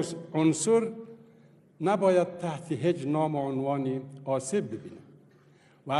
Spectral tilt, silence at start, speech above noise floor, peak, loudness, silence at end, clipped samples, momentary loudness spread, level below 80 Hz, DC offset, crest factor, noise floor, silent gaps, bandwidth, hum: -6 dB/octave; 0 s; 32 dB; -12 dBFS; -28 LUFS; 0 s; under 0.1%; 16 LU; -74 dBFS; under 0.1%; 18 dB; -59 dBFS; none; 12 kHz; none